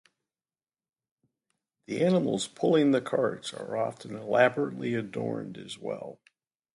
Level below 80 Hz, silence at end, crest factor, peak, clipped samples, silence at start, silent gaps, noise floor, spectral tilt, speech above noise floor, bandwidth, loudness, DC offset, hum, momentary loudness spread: -74 dBFS; 0.6 s; 22 dB; -8 dBFS; under 0.1%; 1.9 s; none; under -90 dBFS; -5.5 dB/octave; over 62 dB; 11.5 kHz; -28 LUFS; under 0.1%; none; 14 LU